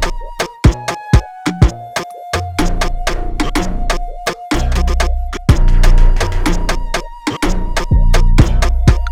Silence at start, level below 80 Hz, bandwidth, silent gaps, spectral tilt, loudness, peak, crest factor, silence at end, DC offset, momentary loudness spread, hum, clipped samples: 0 s; -14 dBFS; 13.5 kHz; none; -5.5 dB/octave; -17 LUFS; 0 dBFS; 12 dB; 0 s; under 0.1%; 8 LU; none; under 0.1%